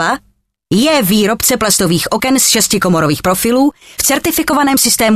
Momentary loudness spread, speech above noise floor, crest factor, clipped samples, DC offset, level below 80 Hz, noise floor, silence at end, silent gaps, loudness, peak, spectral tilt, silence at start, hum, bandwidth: 5 LU; 43 dB; 12 dB; under 0.1%; under 0.1%; -40 dBFS; -55 dBFS; 0 s; none; -11 LUFS; 0 dBFS; -3 dB/octave; 0 s; none; 14.5 kHz